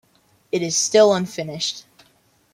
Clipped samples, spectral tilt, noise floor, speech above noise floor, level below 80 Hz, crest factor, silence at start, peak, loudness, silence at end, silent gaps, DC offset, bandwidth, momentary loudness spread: under 0.1%; -3 dB/octave; -60 dBFS; 41 dB; -66 dBFS; 18 dB; 0.55 s; -4 dBFS; -19 LUFS; 0.75 s; none; under 0.1%; 15.5 kHz; 13 LU